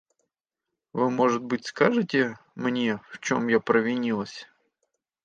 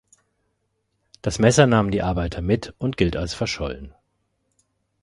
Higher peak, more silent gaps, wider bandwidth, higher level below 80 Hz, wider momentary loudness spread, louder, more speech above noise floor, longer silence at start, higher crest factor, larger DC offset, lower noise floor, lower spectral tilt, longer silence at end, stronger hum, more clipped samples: second, -6 dBFS vs -2 dBFS; neither; second, 8.8 kHz vs 11.5 kHz; second, -72 dBFS vs -38 dBFS; second, 9 LU vs 13 LU; second, -25 LUFS vs -21 LUFS; first, 61 dB vs 52 dB; second, 0.95 s vs 1.25 s; about the same, 20 dB vs 22 dB; neither; first, -86 dBFS vs -73 dBFS; about the same, -5.5 dB/octave vs -5.5 dB/octave; second, 0.8 s vs 1.15 s; neither; neither